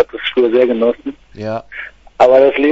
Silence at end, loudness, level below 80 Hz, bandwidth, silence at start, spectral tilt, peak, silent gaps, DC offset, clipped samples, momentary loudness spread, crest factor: 0 s; -13 LUFS; -48 dBFS; 7.8 kHz; 0 s; -6 dB/octave; 0 dBFS; none; under 0.1%; under 0.1%; 20 LU; 14 dB